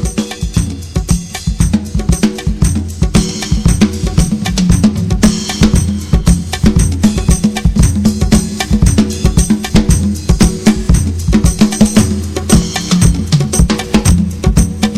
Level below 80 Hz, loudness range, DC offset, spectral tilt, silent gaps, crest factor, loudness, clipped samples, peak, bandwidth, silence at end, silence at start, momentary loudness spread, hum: -16 dBFS; 2 LU; 1%; -5.5 dB/octave; none; 10 dB; -12 LUFS; 0.5%; 0 dBFS; 15 kHz; 0 s; 0 s; 5 LU; none